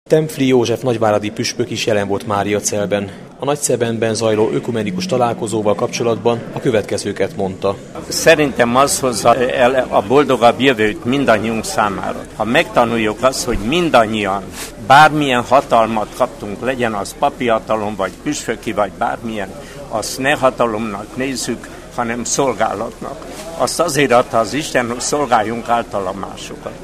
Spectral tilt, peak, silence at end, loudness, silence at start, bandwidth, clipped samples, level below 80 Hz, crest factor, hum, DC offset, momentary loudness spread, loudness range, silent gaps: -4 dB/octave; 0 dBFS; 0 s; -16 LUFS; 0.1 s; 15.5 kHz; under 0.1%; -40 dBFS; 16 dB; none; under 0.1%; 11 LU; 6 LU; none